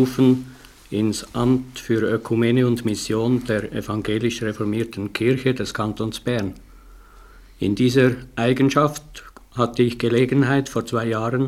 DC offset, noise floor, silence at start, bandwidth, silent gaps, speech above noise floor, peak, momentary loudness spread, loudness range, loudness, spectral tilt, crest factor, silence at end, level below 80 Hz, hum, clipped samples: under 0.1%; -45 dBFS; 0 s; 15.5 kHz; none; 25 dB; -2 dBFS; 9 LU; 4 LU; -21 LUFS; -6.5 dB/octave; 18 dB; 0 s; -48 dBFS; none; under 0.1%